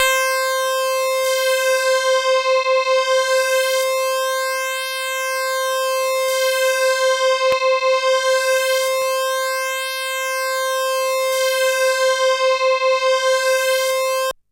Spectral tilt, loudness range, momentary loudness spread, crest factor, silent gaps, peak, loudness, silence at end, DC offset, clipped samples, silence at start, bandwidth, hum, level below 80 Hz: 3 dB/octave; 2 LU; 4 LU; 16 dB; none; -2 dBFS; -18 LUFS; 0.2 s; under 0.1%; under 0.1%; 0 s; 16 kHz; none; -66 dBFS